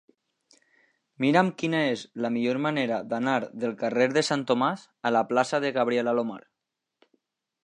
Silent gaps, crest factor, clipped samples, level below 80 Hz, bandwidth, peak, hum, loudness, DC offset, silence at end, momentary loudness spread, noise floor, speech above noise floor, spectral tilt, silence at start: none; 22 dB; under 0.1%; -76 dBFS; 10.5 kHz; -6 dBFS; none; -26 LUFS; under 0.1%; 1.25 s; 7 LU; -85 dBFS; 59 dB; -5.5 dB/octave; 1.2 s